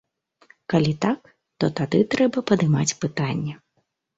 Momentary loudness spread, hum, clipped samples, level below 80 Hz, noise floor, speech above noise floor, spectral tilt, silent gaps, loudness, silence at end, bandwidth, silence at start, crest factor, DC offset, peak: 9 LU; none; under 0.1%; -56 dBFS; -72 dBFS; 50 dB; -5.5 dB/octave; none; -23 LUFS; 0.6 s; 8.2 kHz; 0.7 s; 18 dB; under 0.1%; -6 dBFS